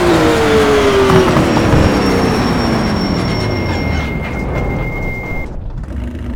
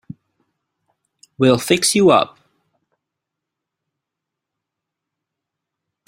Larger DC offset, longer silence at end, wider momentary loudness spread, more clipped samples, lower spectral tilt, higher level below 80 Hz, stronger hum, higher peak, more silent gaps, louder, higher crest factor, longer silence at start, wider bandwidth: neither; second, 0 s vs 3.8 s; first, 13 LU vs 5 LU; neither; first, -6 dB/octave vs -4 dB/octave; first, -24 dBFS vs -60 dBFS; neither; about the same, 0 dBFS vs -2 dBFS; neither; about the same, -13 LUFS vs -15 LUFS; second, 14 dB vs 20 dB; second, 0 s vs 1.4 s; first, over 20 kHz vs 16 kHz